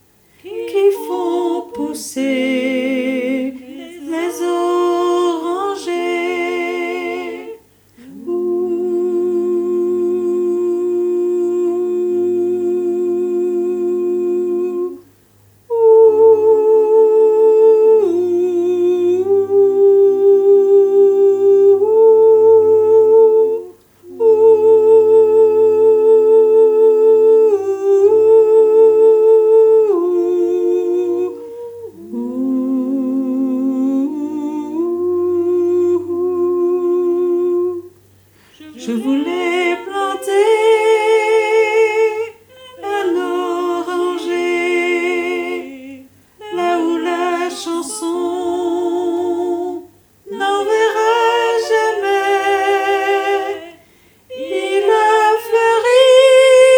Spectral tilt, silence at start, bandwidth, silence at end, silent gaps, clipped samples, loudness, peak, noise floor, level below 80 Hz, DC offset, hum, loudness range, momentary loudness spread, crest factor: -4 dB/octave; 0.45 s; 17.5 kHz; 0 s; none; under 0.1%; -14 LUFS; 0 dBFS; -50 dBFS; -66 dBFS; under 0.1%; 50 Hz at -60 dBFS; 9 LU; 13 LU; 14 dB